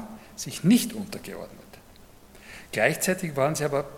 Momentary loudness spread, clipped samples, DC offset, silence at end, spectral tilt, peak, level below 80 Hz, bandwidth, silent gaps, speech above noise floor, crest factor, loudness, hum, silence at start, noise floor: 20 LU; under 0.1%; under 0.1%; 0 s; -4.5 dB/octave; -6 dBFS; -56 dBFS; 17 kHz; none; 25 dB; 22 dB; -26 LUFS; none; 0 s; -51 dBFS